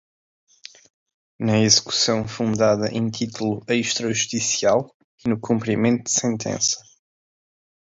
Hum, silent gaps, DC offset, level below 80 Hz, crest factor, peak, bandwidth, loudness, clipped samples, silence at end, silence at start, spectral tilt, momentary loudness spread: none; 4.94-5.18 s; under 0.1%; -58 dBFS; 22 dB; -2 dBFS; 7.8 kHz; -21 LUFS; under 0.1%; 1.1 s; 1.4 s; -3.5 dB/octave; 10 LU